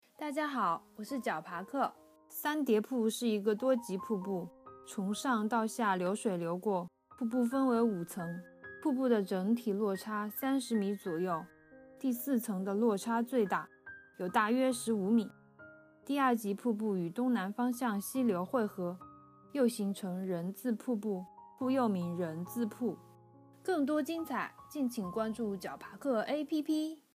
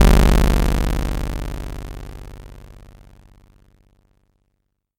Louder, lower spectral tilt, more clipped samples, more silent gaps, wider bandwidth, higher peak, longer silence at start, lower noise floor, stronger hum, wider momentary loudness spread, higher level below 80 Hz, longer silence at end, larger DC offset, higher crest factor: second, -34 LUFS vs -20 LUFS; about the same, -5.5 dB/octave vs -6 dB/octave; neither; neither; about the same, 15.5 kHz vs 17 kHz; second, -16 dBFS vs -2 dBFS; first, 0.2 s vs 0 s; second, -60 dBFS vs -72 dBFS; second, none vs 50 Hz at -45 dBFS; second, 10 LU vs 25 LU; second, -80 dBFS vs -22 dBFS; second, 0.2 s vs 2.4 s; neither; about the same, 20 dB vs 18 dB